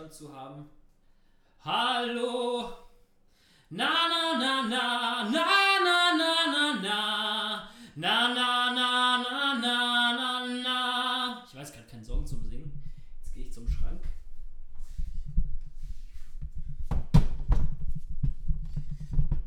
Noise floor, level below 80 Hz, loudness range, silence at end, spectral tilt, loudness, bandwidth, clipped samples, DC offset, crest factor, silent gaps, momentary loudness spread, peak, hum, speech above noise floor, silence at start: -62 dBFS; -34 dBFS; 16 LU; 0 s; -4 dB/octave; -27 LUFS; 12.5 kHz; under 0.1%; under 0.1%; 20 dB; none; 22 LU; -8 dBFS; none; 32 dB; 0 s